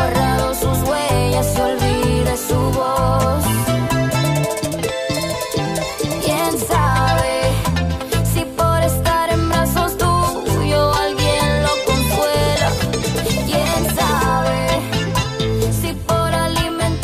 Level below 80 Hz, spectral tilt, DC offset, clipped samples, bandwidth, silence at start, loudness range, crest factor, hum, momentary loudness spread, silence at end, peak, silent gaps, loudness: -28 dBFS; -5 dB/octave; under 0.1%; under 0.1%; 15.5 kHz; 0 s; 2 LU; 12 dB; none; 4 LU; 0 s; -6 dBFS; none; -17 LUFS